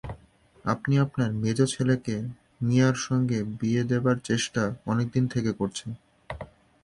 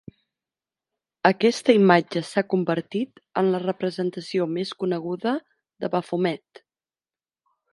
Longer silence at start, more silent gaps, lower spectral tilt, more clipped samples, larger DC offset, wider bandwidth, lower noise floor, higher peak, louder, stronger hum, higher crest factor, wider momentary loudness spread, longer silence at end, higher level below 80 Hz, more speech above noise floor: second, 0.05 s vs 1.25 s; neither; about the same, -6 dB/octave vs -6 dB/octave; neither; neither; about the same, 11.5 kHz vs 11.5 kHz; second, -57 dBFS vs under -90 dBFS; second, -8 dBFS vs 0 dBFS; about the same, -26 LUFS vs -24 LUFS; neither; second, 18 dB vs 24 dB; first, 17 LU vs 11 LU; second, 0.4 s vs 1.35 s; first, -54 dBFS vs -72 dBFS; second, 32 dB vs over 67 dB